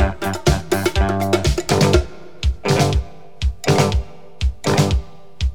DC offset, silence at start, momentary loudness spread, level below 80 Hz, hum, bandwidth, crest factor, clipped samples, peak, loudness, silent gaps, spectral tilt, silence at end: 2%; 0 s; 9 LU; -24 dBFS; none; 18 kHz; 18 dB; under 0.1%; 0 dBFS; -19 LUFS; none; -5.5 dB/octave; 0 s